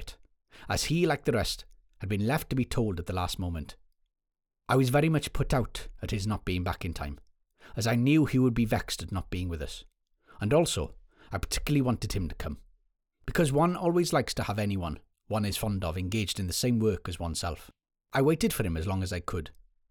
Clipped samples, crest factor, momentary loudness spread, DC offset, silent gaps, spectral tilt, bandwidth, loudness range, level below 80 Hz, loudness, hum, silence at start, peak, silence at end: under 0.1%; 18 dB; 14 LU; under 0.1%; none; -5.5 dB/octave; over 20 kHz; 2 LU; -44 dBFS; -30 LUFS; none; 0 s; -12 dBFS; 0.4 s